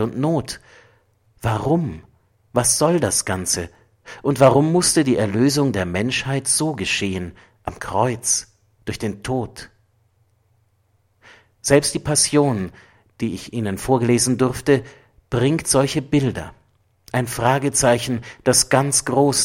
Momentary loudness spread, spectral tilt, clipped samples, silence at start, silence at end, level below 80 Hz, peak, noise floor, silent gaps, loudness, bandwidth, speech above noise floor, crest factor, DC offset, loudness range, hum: 14 LU; -4 dB/octave; under 0.1%; 0 s; 0 s; -48 dBFS; -2 dBFS; -63 dBFS; none; -19 LUFS; 16.5 kHz; 44 dB; 20 dB; under 0.1%; 7 LU; none